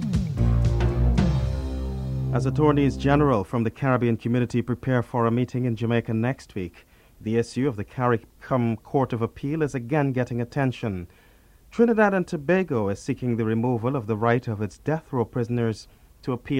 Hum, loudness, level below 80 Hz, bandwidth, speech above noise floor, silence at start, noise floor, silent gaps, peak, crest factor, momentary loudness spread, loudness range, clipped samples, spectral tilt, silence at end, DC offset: none; -25 LUFS; -34 dBFS; 11 kHz; 29 dB; 0 s; -53 dBFS; none; -6 dBFS; 18 dB; 10 LU; 4 LU; under 0.1%; -8 dB/octave; 0 s; under 0.1%